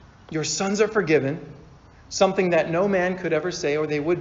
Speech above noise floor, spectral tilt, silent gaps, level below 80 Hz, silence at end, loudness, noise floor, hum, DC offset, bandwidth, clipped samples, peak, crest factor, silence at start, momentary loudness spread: 26 dB; -4.5 dB/octave; none; -54 dBFS; 0 s; -23 LUFS; -48 dBFS; none; under 0.1%; 7.6 kHz; under 0.1%; -6 dBFS; 18 dB; 0.3 s; 9 LU